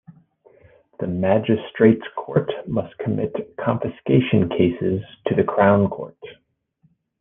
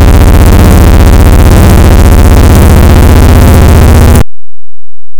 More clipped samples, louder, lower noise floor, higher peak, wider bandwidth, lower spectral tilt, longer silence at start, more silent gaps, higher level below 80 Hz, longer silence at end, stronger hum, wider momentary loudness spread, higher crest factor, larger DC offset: second, under 0.1% vs 70%; second, -21 LUFS vs -3 LUFS; second, -64 dBFS vs under -90 dBFS; about the same, -2 dBFS vs 0 dBFS; second, 3.8 kHz vs over 20 kHz; first, -11 dB/octave vs -6.5 dB/octave; about the same, 0.1 s vs 0 s; neither; second, -56 dBFS vs -4 dBFS; first, 0.85 s vs 0 s; neither; first, 10 LU vs 1 LU; first, 20 dB vs 0 dB; neither